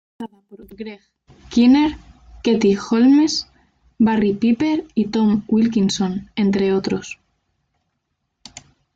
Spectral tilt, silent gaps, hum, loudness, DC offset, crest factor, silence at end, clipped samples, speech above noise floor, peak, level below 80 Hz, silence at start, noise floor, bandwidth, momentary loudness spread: -6 dB/octave; none; none; -18 LUFS; under 0.1%; 14 dB; 0.35 s; under 0.1%; 57 dB; -4 dBFS; -50 dBFS; 0.2 s; -74 dBFS; 7.8 kHz; 21 LU